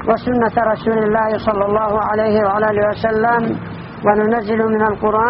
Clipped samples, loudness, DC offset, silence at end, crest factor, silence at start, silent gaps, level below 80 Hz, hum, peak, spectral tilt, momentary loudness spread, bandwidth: under 0.1%; -16 LUFS; under 0.1%; 0 s; 16 dB; 0 s; none; -42 dBFS; none; 0 dBFS; -5.5 dB/octave; 2 LU; 5.8 kHz